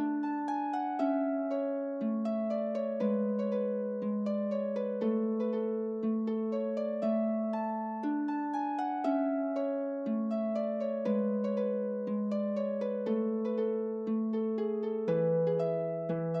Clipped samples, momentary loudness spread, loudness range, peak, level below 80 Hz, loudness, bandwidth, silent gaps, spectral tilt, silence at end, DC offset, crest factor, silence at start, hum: under 0.1%; 3 LU; 1 LU; -20 dBFS; -84 dBFS; -33 LUFS; 6.2 kHz; none; -9.5 dB/octave; 0 s; under 0.1%; 12 dB; 0 s; none